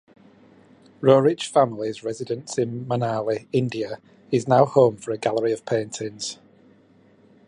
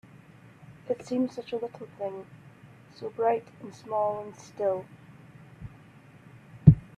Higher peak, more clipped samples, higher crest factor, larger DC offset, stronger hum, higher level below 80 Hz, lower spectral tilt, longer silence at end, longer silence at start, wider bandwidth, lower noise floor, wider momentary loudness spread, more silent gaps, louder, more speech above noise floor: about the same, -2 dBFS vs -2 dBFS; neither; second, 22 dB vs 28 dB; neither; neither; second, -66 dBFS vs -48 dBFS; second, -6 dB/octave vs -9.5 dB/octave; first, 1.15 s vs 0.2 s; first, 1 s vs 0.85 s; first, 11 kHz vs 8.4 kHz; about the same, -55 dBFS vs -53 dBFS; second, 13 LU vs 24 LU; neither; first, -23 LUFS vs -29 LUFS; first, 34 dB vs 21 dB